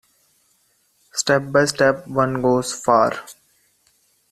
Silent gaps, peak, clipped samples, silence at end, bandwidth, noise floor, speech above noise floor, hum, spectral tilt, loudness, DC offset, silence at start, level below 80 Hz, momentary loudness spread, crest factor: none; -2 dBFS; under 0.1%; 1 s; 14 kHz; -63 dBFS; 45 dB; none; -4 dB/octave; -19 LUFS; under 0.1%; 1.15 s; -56 dBFS; 7 LU; 20 dB